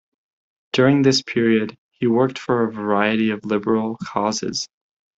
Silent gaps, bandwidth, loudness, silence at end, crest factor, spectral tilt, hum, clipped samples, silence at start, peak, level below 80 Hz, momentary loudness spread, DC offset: 1.78-1.91 s; 8 kHz; -20 LUFS; 0.5 s; 18 dB; -5 dB/octave; none; under 0.1%; 0.75 s; -2 dBFS; -60 dBFS; 9 LU; under 0.1%